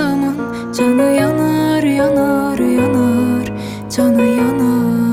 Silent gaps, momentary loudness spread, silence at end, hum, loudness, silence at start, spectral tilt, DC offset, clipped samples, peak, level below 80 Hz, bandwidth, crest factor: none; 7 LU; 0 s; none; -14 LUFS; 0 s; -6.5 dB/octave; under 0.1%; under 0.1%; -2 dBFS; -46 dBFS; 16 kHz; 12 dB